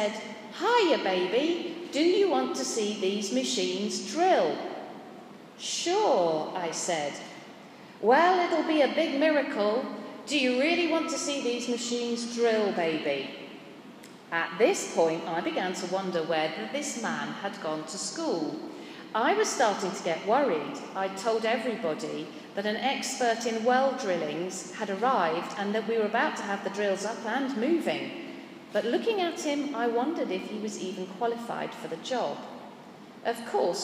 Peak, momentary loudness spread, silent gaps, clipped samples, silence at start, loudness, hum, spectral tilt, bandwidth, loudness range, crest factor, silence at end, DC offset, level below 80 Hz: -8 dBFS; 14 LU; none; under 0.1%; 0 s; -28 LUFS; none; -3.5 dB/octave; 15.5 kHz; 5 LU; 20 dB; 0 s; under 0.1%; -88 dBFS